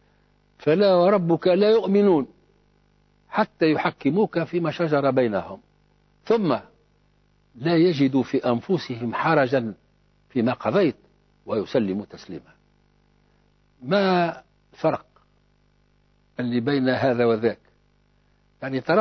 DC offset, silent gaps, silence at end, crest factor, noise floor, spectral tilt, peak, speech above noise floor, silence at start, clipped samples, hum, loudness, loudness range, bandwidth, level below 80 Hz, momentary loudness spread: under 0.1%; none; 0 s; 16 dB; -63 dBFS; -8 dB/octave; -8 dBFS; 41 dB; 0.65 s; under 0.1%; 50 Hz at -55 dBFS; -22 LUFS; 6 LU; 6.4 kHz; -62 dBFS; 15 LU